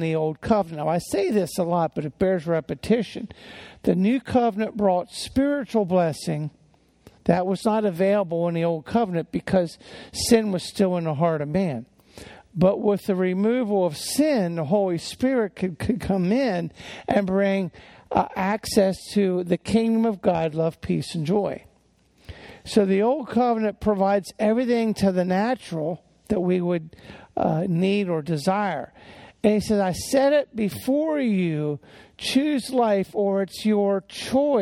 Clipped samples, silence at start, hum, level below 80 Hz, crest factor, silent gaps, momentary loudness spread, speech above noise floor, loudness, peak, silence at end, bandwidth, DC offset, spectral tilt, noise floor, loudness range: under 0.1%; 0 s; none; -52 dBFS; 20 dB; none; 8 LU; 38 dB; -23 LUFS; -4 dBFS; 0 s; 16 kHz; under 0.1%; -6 dB/octave; -61 dBFS; 2 LU